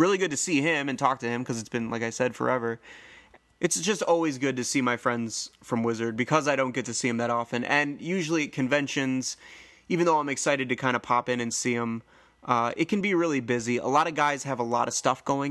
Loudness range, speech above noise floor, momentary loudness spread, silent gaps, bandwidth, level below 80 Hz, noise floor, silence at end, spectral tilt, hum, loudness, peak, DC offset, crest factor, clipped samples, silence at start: 2 LU; 28 dB; 7 LU; none; 12.5 kHz; -68 dBFS; -55 dBFS; 0 s; -4 dB/octave; none; -27 LUFS; -6 dBFS; under 0.1%; 20 dB; under 0.1%; 0 s